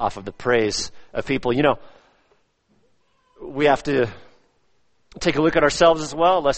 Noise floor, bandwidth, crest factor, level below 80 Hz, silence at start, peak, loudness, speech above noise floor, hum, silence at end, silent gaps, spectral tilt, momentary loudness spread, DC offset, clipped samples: -68 dBFS; 8.8 kHz; 20 dB; -44 dBFS; 0 s; -2 dBFS; -20 LUFS; 48 dB; none; 0 s; none; -4.5 dB/octave; 12 LU; under 0.1%; under 0.1%